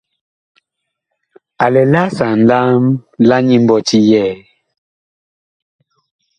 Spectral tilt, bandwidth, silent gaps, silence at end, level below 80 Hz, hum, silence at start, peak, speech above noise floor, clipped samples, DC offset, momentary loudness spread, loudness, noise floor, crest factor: -6.5 dB/octave; 9.8 kHz; none; 2 s; -54 dBFS; none; 1.6 s; 0 dBFS; 65 dB; under 0.1%; under 0.1%; 6 LU; -12 LUFS; -76 dBFS; 14 dB